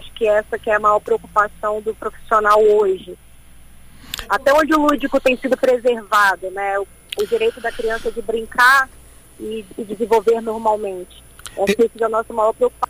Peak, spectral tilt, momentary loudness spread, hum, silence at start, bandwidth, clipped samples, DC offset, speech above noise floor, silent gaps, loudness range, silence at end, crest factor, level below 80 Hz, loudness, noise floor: -2 dBFS; -3.5 dB/octave; 15 LU; none; 0 s; 15.5 kHz; under 0.1%; under 0.1%; 24 dB; none; 2 LU; 0.05 s; 16 dB; -44 dBFS; -17 LUFS; -42 dBFS